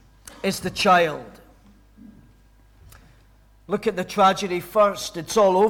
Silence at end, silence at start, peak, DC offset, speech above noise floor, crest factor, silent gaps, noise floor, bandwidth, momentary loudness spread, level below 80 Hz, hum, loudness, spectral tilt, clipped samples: 0 s; 0.45 s; -6 dBFS; under 0.1%; 34 dB; 16 dB; none; -54 dBFS; 18.5 kHz; 11 LU; -54 dBFS; none; -21 LUFS; -4 dB/octave; under 0.1%